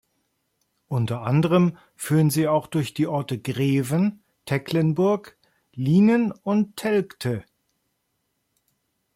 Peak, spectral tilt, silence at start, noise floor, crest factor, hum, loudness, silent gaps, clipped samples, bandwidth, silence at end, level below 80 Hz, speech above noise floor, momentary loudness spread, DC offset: -8 dBFS; -7 dB/octave; 0.9 s; -75 dBFS; 16 dB; none; -23 LUFS; none; under 0.1%; 16.5 kHz; 1.75 s; -62 dBFS; 53 dB; 10 LU; under 0.1%